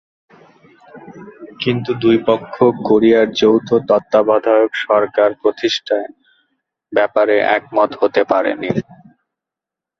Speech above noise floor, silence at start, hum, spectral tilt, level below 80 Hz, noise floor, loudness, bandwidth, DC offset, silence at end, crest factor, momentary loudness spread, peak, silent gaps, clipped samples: 71 dB; 0.95 s; none; -6 dB/octave; -58 dBFS; -86 dBFS; -15 LUFS; 7.2 kHz; under 0.1%; 1.2 s; 16 dB; 8 LU; -2 dBFS; none; under 0.1%